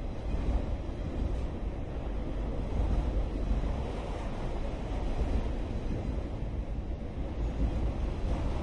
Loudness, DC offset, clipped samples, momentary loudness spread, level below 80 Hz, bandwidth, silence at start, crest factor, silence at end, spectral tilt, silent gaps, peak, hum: -36 LUFS; under 0.1%; under 0.1%; 5 LU; -34 dBFS; 8 kHz; 0 s; 14 dB; 0 s; -8 dB/octave; none; -18 dBFS; none